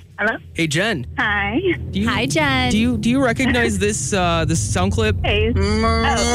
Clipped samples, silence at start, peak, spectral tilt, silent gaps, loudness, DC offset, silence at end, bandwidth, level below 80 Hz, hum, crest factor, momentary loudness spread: under 0.1%; 0 s; -8 dBFS; -4.5 dB/octave; none; -18 LUFS; under 0.1%; 0 s; 15.5 kHz; -30 dBFS; none; 10 dB; 4 LU